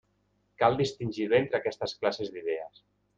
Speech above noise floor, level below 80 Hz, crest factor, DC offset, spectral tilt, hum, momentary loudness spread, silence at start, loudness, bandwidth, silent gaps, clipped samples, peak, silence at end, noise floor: 43 dB; -64 dBFS; 22 dB; under 0.1%; -6 dB/octave; 50 Hz at -55 dBFS; 9 LU; 0.6 s; -29 LUFS; 7.8 kHz; none; under 0.1%; -10 dBFS; 0.5 s; -72 dBFS